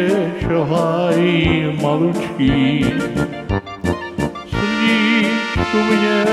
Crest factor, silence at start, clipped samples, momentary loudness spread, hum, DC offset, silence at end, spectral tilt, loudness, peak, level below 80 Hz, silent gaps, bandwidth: 14 dB; 0 s; under 0.1%; 8 LU; none; under 0.1%; 0 s; -6 dB/octave; -17 LUFS; -2 dBFS; -36 dBFS; none; 13 kHz